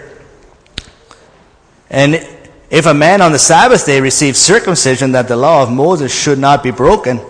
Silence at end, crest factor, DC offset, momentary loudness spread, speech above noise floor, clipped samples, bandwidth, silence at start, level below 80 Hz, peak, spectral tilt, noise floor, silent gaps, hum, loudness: 0 s; 10 dB; under 0.1%; 10 LU; 37 dB; 0.3%; 11 kHz; 0 s; -38 dBFS; 0 dBFS; -3.5 dB/octave; -46 dBFS; none; none; -9 LUFS